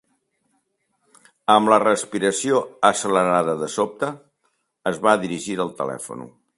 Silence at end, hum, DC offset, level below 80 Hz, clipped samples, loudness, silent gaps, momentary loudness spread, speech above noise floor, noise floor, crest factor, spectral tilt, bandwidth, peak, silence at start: 0.3 s; none; under 0.1%; -64 dBFS; under 0.1%; -20 LUFS; none; 12 LU; 50 dB; -70 dBFS; 22 dB; -4 dB/octave; 11.5 kHz; 0 dBFS; 1.5 s